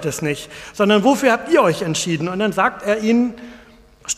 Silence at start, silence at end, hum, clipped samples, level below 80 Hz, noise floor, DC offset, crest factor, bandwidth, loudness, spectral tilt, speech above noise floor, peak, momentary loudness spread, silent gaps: 0 s; 0.05 s; none; under 0.1%; -52 dBFS; -44 dBFS; under 0.1%; 16 dB; 15.5 kHz; -18 LUFS; -4.5 dB/octave; 27 dB; -2 dBFS; 12 LU; none